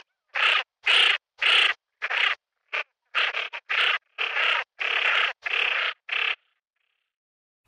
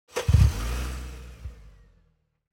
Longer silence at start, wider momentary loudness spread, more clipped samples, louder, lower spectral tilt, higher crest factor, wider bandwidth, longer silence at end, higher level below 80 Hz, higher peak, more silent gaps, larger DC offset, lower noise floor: first, 0.35 s vs 0.15 s; second, 13 LU vs 22 LU; neither; about the same, -23 LUFS vs -25 LUFS; second, 2 dB/octave vs -6 dB/octave; about the same, 18 dB vs 20 dB; second, 11.5 kHz vs 17 kHz; first, 1.3 s vs 0.85 s; second, -72 dBFS vs -30 dBFS; about the same, -8 dBFS vs -8 dBFS; neither; neither; first, -77 dBFS vs -67 dBFS